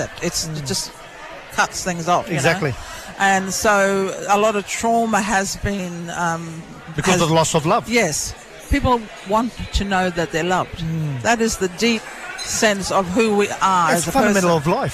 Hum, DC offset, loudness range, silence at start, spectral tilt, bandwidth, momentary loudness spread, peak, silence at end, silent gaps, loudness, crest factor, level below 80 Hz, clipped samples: none; under 0.1%; 3 LU; 0 s; -4 dB/octave; 15.5 kHz; 11 LU; -4 dBFS; 0 s; none; -19 LUFS; 14 dB; -36 dBFS; under 0.1%